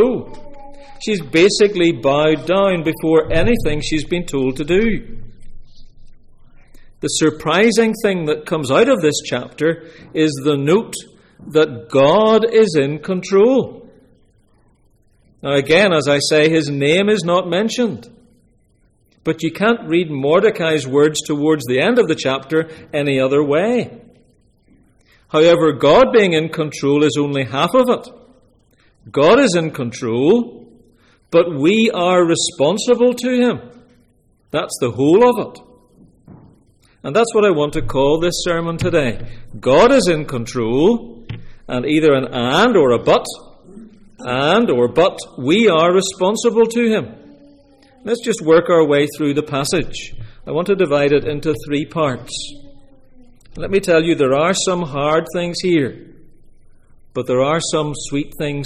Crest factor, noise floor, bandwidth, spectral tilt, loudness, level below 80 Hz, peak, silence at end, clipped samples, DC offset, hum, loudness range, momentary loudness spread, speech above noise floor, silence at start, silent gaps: 14 dB; -56 dBFS; 15 kHz; -5 dB/octave; -16 LUFS; -38 dBFS; -2 dBFS; 0 s; under 0.1%; under 0.1%; none; 4 LU; 12 LU; 41 dB; 0 s; none